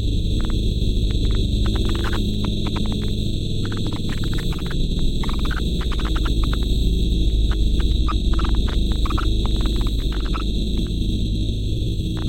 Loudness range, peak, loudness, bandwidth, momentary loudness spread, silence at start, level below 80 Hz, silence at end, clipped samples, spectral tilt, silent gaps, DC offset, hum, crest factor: 3 LU; -6 dBFS; -23 LUFS; 13 kHz; 3 LU; 0 s; -20 dBFS; 0 s; under 0.1%; -6 dB/octave; none; under 0.1%; none; 14 dB